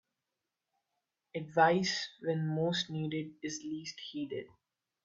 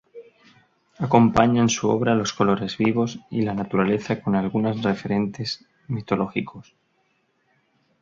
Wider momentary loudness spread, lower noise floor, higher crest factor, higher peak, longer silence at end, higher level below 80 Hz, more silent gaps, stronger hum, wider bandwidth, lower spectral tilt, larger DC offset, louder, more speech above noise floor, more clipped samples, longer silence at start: about the same, 14 LU vs 12 LU; first, -89 dBFS vs -68 dBFS; about the same, 22 dB vs 20 dB; second, -14 dBFS vs -2 dBFS; second, 0.6 s vs 1.4 s; second, -76 dBFS vs -52 dBFS; neither; neither; about the same, 7.8 kHz vs 7.6 kHz; second, -4.5 dB/octave vs -6 dB/octave; neither; second, -34 LUFS vs -22 LUFS; first, 55 dB vs 46 dB; neither; first, 1.35 s vs 0.15 s